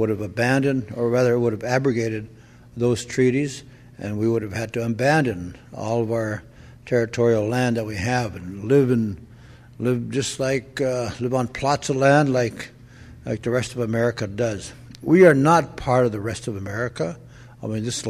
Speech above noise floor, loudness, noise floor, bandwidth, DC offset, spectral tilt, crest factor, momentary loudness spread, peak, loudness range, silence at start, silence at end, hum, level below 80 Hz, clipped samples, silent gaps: 24 dB; -22 LUFS; -45 dBFS; 14 kHz; under 0.1%; -6 dB/octave; 20 dB; 15 LU; -2 dBFS; 4 LU; 0 s; 0 s; none; -50 dBFS; under 0.1%; none